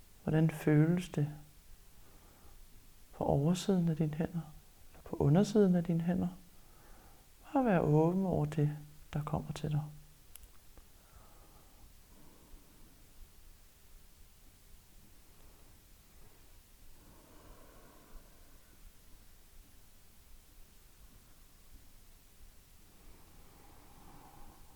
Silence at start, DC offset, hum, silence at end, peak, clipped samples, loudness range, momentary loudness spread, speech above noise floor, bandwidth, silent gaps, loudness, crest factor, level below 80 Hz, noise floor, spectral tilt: 0.25 s; under 0.1%; none; 0.25 s; -16 dBFS; under 0.1%; 11 LU; 28 LU; 28 dB; over 20 kHz; none; -33 LUFS; 22 dB; -58 dBFS; -59 dBFS; -8 dB/octave